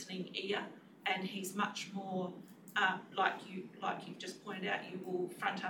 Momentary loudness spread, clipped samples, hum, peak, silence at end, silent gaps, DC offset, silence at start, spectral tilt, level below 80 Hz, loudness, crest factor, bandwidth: 11 LU; under 0.1%; none; -18 dBFS; 0 s; none; under 0.1%; 0 s; -4 dB/octave; under -90 dBFS; -39 LUFS; 22 dB; 19 kHz